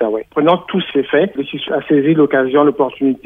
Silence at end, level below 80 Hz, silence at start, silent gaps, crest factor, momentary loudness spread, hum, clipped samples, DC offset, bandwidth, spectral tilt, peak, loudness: 0.1 s; -56 dBFS; 0 s; none; 14 dB; 7 LU; none; under 0.1%; under 0.1%; 3.8 kHz; -9 dB/octave; 0 dBFS; -15 LUFS